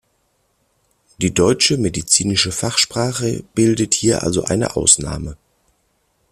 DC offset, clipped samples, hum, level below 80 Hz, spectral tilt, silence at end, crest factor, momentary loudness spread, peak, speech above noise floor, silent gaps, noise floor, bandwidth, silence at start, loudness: under 0.1%; under 0.1%; none; -42 dBFS; -3.5 dB/octave; 0.95 s; 18 dB; 9 LU; 0 dBFS; 47 dB; none; -65 dBFS; 15 kHz; 1.2 s; -16 LUFS